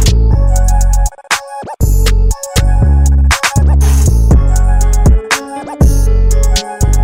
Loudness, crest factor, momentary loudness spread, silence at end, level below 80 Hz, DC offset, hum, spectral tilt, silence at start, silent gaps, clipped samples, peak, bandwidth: -12 LUFS; 8 dB; 6 LU; 0 s; -10 dBFS; under 0.1%; none; -5 dB/octave; 0 s; none; under 0.1%; 0 dBFS; 16.5 kHz